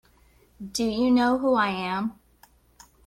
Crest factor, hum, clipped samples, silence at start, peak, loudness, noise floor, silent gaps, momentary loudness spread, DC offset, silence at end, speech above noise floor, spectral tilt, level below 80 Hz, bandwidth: 16 dB; none; under 0.1%; 0.6 s; -10 dBFS; -24 LUFS; -59 dBFS; none; 12 LU; under 0.1%; 0.95 s; 35 dB; -4.5 dB/octave; -56 dBFS; 14 kHz